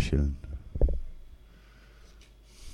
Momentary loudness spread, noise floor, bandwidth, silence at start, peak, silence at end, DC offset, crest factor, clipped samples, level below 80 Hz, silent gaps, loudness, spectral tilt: 26 LU; -54 dBFS; 11 kHz; 0 s; -12 dBFS; 0 s; under 0.1%; 20 dB; under 0.1%; -32 dBFS; none; -33 LUFS; -7 dB/octave